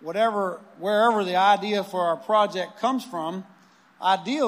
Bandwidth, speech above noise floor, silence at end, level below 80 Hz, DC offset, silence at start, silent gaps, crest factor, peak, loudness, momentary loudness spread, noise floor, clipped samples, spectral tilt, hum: 15.5 kHz; 31 dB; 0 s; -86 dBFS; under 0.1%; 0 s; none; 18 dB; -6 dBFS; -24 LUFS; 11 LU; -54 dBFS; under 0.1%; -4.5 dB/octave; none